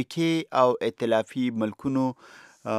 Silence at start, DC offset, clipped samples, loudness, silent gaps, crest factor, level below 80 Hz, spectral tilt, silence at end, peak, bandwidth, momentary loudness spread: 0 s; under 0.1%; under 0.1%; -26 LUFS; none; 18 dB; -68 dBFS; -6 dB/octave; 0 s; -6 dBFS; 14 kHz; 8 LU